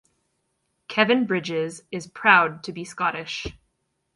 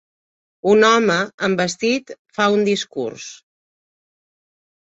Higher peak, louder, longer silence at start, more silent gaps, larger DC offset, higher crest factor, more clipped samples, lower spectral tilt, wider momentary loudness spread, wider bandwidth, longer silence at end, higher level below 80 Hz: about the same, -2 dBFS vs -2 dBFS; second, -22 LUFS vs -18 LUFS; first, 0.9 s vs 0.65 s; second, none vs 1.34-1.38 s, 2.19-2.25 s; neither; about the same, 22 dB vs 18 dB; neither; about the same, -4.5 dB/octave vs -4 dB/octave; first, 18 LU vs 15 LU; first, 11.5 kHz vs 8 kHz; second, 0.65 s vs 1.5 s; first, -56 dBFS vs -62 dBFS